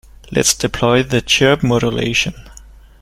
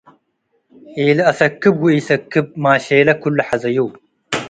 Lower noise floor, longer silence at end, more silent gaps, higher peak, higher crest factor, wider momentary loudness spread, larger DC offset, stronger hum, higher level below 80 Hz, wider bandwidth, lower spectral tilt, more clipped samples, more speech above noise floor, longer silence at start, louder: second, -40 dBFS vs -66 dBFS; first, 0.4 s vs 0 s; neither; about the same, 0 dBFS vs 0 dBFS; about the same, 16 dB vs 16 dB; about the same, 5 LU vs 7 LU; neither; neither; first, -36 dBFS vs -58 dBFS; first, 16 kHz vs 9.4 kHz; second, -3.5 dB/octave vs -6 dB/octave; neither; second, 25 dB vs 51 dB; second, 0.25 s vs 0.9 s; about the same, -15 LUFS vs -15 LUFS